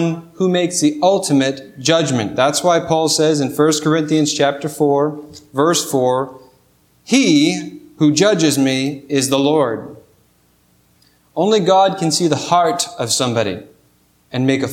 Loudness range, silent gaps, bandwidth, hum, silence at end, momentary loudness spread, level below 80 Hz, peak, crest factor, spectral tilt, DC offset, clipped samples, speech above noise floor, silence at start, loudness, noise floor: 2 LU; none; 16.5 kHz; 60 Hz at -50 dBFS; 0 s; 8 LU; -60 dBFS; 0 dBFS; 16 dB; -4.5 dB/octave; under 0.1%; under 0.1%; 41 dB; 0 s; -16 LUFS; -56 dBFS